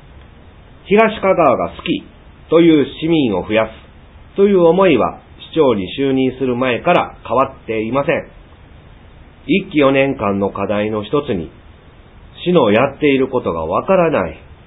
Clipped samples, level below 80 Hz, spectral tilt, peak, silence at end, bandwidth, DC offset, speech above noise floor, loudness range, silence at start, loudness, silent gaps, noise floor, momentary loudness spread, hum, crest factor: under 0.1%; -42 dBFS; -9.5 dB/octave; 0 dBFS; 0.1 s; 4 kHz; under 0.1%; 27 dB; 4 LU; 0.85 s; -15 LUFS; none; -42 dBFS; 10 LU; none; 16 dB